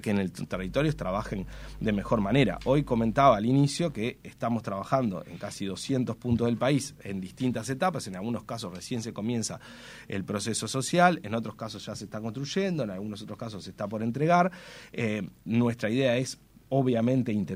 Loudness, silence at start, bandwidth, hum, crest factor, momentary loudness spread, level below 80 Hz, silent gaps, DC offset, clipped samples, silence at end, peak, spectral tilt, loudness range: -29 LUFS; 0 s; 16 kHz; none; 22 dB; 14 LU; -50 dBFS; none; under 0.1%; under 0.1%; 0 s; -6 dBFS; -6 dB/octave; 6 LU